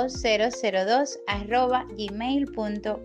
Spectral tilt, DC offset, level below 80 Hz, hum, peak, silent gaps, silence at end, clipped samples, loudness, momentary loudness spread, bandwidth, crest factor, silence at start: -4 dB/octave; under 0.1%; -46 dBFS; none; -8 dBFS; none; 0 s; under 0.1%; -26 LUFS; 7 LU; 9.8 kHz; 16 dB; 0 s